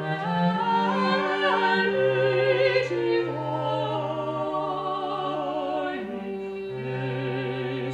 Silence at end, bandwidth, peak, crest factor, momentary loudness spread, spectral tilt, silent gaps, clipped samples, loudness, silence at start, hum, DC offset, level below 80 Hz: 0 s; 9.2 kHz; -10 dBFS; 16 dB; 9 LU; -7 dB/octave; none; under 0.1%; -26 LUFS; 0 s; none; under 0.1%; -64 dBFS